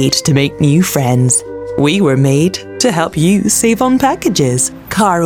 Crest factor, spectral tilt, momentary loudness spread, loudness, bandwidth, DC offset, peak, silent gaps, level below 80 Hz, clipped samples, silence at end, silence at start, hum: 12 dB; -4.5 dB/octave; 4 LU; -12 LUFS; 19.5 kHz; under 0.1%; 0 dBFS; none; -42 dBFS; under 0.1%; 0 s; 0 s; none